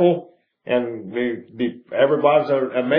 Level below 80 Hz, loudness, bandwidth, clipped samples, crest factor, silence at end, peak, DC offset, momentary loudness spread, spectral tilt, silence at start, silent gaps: -72 dBFS; -21 LUFS; 5.2 kHz; under 0.1%; 18 dB; 0 s; -2 dBFS; under 0.1%; 10 LU; -9.5 dB/octave; 0 s; none